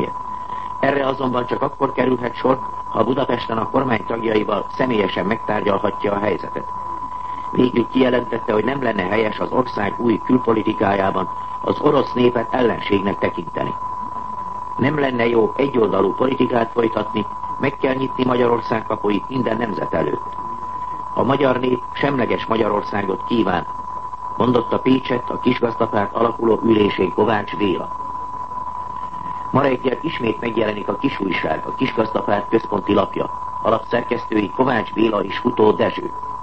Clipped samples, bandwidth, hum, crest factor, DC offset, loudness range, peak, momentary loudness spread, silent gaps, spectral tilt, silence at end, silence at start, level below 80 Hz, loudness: under 0.1%; 8.2 kHz; none; 18 dB; 1%; 2 LU; -2 dBFS; 10 LU; none; -8 dB/octave; 0 s; 0 s; -46 dBFS; -20 LUFS